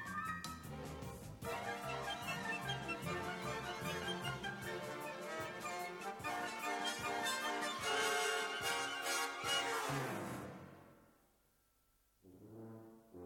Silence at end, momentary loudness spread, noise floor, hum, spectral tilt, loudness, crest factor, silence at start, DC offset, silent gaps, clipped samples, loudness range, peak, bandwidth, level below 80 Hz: 0 s; 13 LU; -76 dBFS; none; -3 dB/octave; -41 LUFS; 20 dB; 0 s; under 0.1%; none; under 0.1%; 6 LU; -24 dBFS; 19 kHz; -68 dBFS